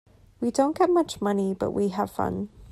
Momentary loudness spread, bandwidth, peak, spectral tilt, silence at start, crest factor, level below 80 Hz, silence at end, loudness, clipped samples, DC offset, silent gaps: 7 LU; 14.5 kHz; -10 dBFS; -6.5 dB/octave; 0.4 s; 16 dB; -54 dBFS; 0.05 s; -26 LUFS; under 0.1%; under 0.1%; none